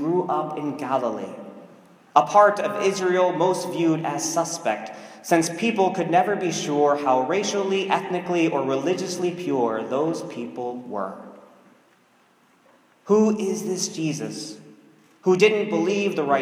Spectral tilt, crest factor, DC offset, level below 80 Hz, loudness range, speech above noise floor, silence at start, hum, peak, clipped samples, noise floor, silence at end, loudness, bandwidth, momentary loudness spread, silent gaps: -4.5 dB/octave; 22 dB; under 0.1%; -76 dBFS; 6 LU; 37 dB; 0 s; none; 0 dBFS; under 0.1%; -59 dBFS; 0 s; -23 LUFS; 16 kHz; 12 LU; none